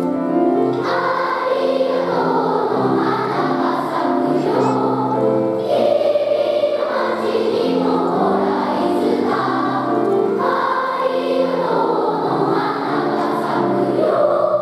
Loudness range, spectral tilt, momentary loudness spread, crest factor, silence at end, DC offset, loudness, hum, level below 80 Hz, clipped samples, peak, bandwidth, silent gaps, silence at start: 1 LU; -7 dB/octave; 3 LU; 14 dB; 0 s; under 0.1%; -18 LUFS; none; -66 dBFS; under 0.1%; -4 dBFS; 13 kHz; none; 0 s